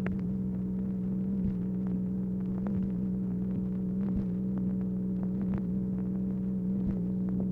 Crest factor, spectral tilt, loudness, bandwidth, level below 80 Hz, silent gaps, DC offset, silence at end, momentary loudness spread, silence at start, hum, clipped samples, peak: 12 dB; -12 dB/octave; -32 LUFS; 2.8 kHz; -48 dBFS; none; under 0.1%; 0 s; 2 LU; 0 s; none; under 0.1%; -18 dBFS